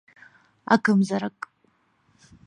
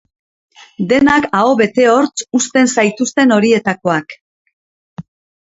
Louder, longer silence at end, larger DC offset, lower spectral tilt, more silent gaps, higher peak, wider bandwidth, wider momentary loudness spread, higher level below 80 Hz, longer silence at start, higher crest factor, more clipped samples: second, -23 LUFS vs -13 LUFS; first, 1.2 s vs 0.4 s; neither; first, -6.5 dB/octave vs -4 dB/octave; second, none vs 4.21-4.45 s, 4.53-4.97 s; about the same, -2 dBFS vs 0 dBFS; first, 10.5 kHz vs 8 kHz; first, 21 LU vs 6 LU; second, -70 dBFS vs -52 dBFS; about the same, 0.7 s vs 0.8 s; first, 24 dB vs 14 dB; neither